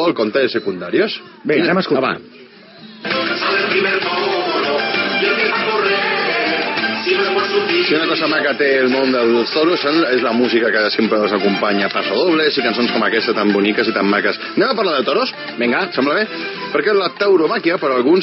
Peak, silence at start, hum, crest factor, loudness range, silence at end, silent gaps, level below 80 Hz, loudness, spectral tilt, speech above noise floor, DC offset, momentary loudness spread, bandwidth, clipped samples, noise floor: -4 dBFS; 0 s; none; 12 dB; 3 LU; 0 s; none; -72 dBFS; -16 LUFS; -2 dB/octave; 24 dB; under 0.1%; 4 LU; 6 kHz; under 0.1%; -39 dBFS